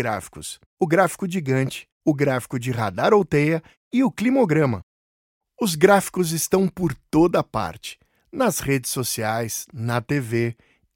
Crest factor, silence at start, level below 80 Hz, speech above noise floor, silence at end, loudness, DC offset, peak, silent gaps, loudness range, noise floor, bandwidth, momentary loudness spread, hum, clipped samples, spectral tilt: 20 dB; 0 s; -52 dBFS; over 69 dB; 0.4 s; -22 LUFS; under 0.1%; -2 dBFS; 0.66-0.77 s, 1.92-2.01 s, 3.77-3.91 s, 4.83-5.41 s; 3 LU; under -90 dBFS; 17 kHz; 10 LU; none; under 0.1%; -5.5 dB/octave